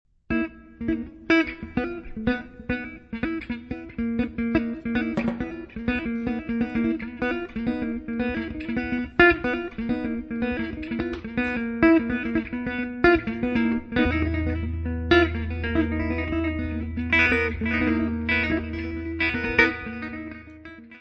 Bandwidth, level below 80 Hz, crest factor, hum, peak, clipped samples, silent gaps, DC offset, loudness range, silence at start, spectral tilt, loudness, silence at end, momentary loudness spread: 6.4 kHz; -38 dBFS; 24 dB; none; -2 dBFS; under 0.1%; none; under 0.1%; 5 LU; 0.3 s; -7.5 dB/octave; -25 LUFS; 0 s; 12 LU